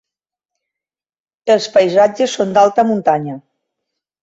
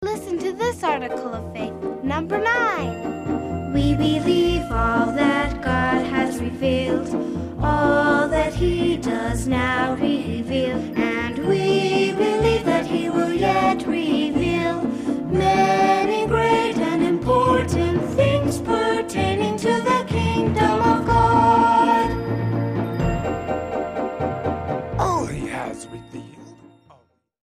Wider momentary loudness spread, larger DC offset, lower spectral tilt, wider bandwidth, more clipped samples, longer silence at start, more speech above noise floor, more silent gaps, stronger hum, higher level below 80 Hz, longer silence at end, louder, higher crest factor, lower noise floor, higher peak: first, 12 LU vs 9 LU; neither; about the same, -5 dB/octave vs -6 dB/octave; second, 8 kHz vs 15 kHz; neither; first, 1.45 s vs 0 s; first, 74 dB vs 36 dB; neither; neither; second, -62 dBFS vs -36 dBFS; about the same, 0.85 s vs 0.9 s; first, -14 LUFS vs -21 LUFS; about the same, 16 dB vs 14 dB; first, -88 dBFS vs -57 dBFS; first, -2 dBFS vs -6 dBFS